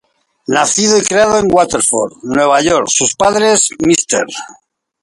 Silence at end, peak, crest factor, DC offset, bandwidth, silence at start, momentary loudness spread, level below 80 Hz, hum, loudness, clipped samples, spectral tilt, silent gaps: 0.5 s; 0 dBFS; 12 dB; under 0.1%; 11.5 kHz; 0.5 s; 7 LU; -46 dBFS; none; -11 LUFS; under 0.1%; -2.5 dB/octave; none